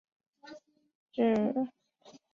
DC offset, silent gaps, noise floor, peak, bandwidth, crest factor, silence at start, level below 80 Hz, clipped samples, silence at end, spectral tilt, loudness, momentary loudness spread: under 0.1%; 0.95-1.06 s; -59 dBFS; -16 dBFS; 7 kHz; 18 dB; 0.45 s; -76 dBFS; under 0.1%; 0.65 s; -7.5 dB/octave; -31 LUFS; 24 LU